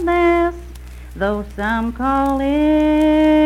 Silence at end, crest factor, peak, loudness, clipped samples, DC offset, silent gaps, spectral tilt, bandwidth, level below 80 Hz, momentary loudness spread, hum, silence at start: 0 s; 10 dB; -6 dBFS; -17 LUFS; under 0.1%; under 0.1%; none; -7 dB/octave; 12.5 kHz; -32 dBFS; 21 LU; none; 0 s